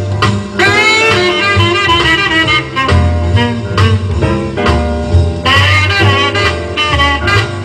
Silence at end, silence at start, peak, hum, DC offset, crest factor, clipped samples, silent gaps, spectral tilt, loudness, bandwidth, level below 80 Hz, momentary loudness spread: 0 s; 0 s; 0 dBFS; none; under 0.1%; 10 dB; under 0.1%; none; -5 dB/octave; -10 LUFS; 11 kHz; -22 dBFS; 6 LU